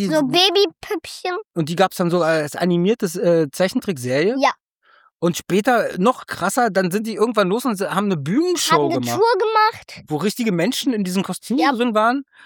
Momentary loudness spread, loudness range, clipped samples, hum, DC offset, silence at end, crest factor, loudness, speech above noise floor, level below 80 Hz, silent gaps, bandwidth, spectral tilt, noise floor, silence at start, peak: 7 LU; 1 LU; under 0.1%; none; under 0.1%; 0.25 s; 18 dB; -19 LUFS; 37 dB; -64 dBFS; 4.76-4.80 s; 19.5 kHz; -4.5 dB/octave; -56 dBFS; 0 s; -2 dBFS